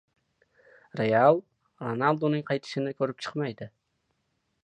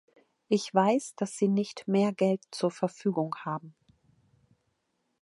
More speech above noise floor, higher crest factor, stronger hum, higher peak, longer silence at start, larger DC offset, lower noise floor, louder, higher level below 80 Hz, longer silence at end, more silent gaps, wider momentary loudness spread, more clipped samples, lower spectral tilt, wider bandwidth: about the same, 50 dB vs 50 dB; about the same, 22 dB vs 22 dB; neither; about the same, -8 dBFS vs -8 dBFS; first, 0.95 s vs 0.5 s; neither; about the same, -76 dBFS vs -78 dBFS; about the same, -27 LUFS vs -29 LUFS; first, -74 dBFS vs -80 dBFS; second, 0.95 s vs 1.5 s; neither; first, 17 LU vs 9 LU; neither; about the same, -7 dB/octave vs -6 dB/octave; second, 9.8 kHz vs 11.5 kHz